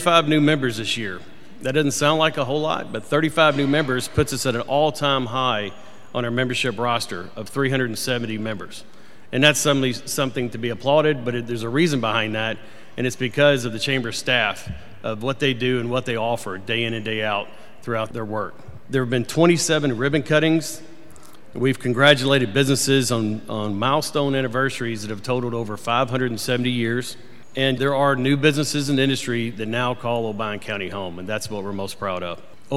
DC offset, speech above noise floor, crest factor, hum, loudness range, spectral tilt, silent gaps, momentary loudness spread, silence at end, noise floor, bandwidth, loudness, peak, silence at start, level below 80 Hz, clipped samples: 2%; 26 dB; 22 dB; none; 5 LU; -4.5 dB/octave; none; 12 LU; 0 s; -47 dBFS; 16 kHz; -21 LUFS; 0 dBFS; 0 s; -54 dBFS; under 0.1%